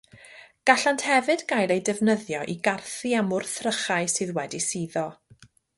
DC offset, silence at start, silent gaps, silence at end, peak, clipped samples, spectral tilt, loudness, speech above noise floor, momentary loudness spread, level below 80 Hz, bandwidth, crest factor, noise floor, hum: under 0.1%; 0.15 s; none; 0.65 s; -4 dBFS; under 0.1%; -3.5 dB/octave; -25 LUFS; 31 dB; 9 LU; -68 dBFS; 11.5 kHz; 22 dB; -56 dBFS; none